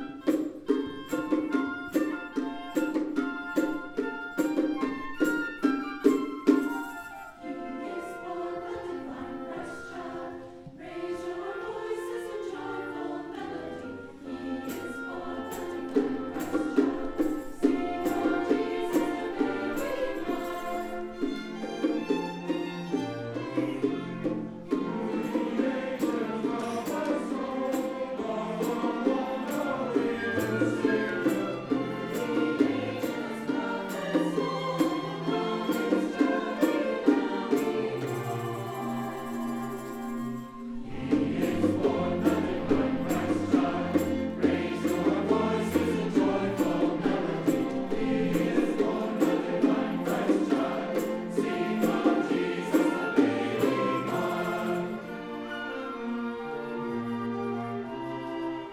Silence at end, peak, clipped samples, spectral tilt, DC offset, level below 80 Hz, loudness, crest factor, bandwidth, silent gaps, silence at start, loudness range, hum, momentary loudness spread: 0 s; -8 dBFS; under 0.1%; -6 dB/octave; under 0.1%; -58 dBFS; -30 LUFS; 22 dB; 19.5 kHz; none; 0 s; 9 LU; none; 10 LU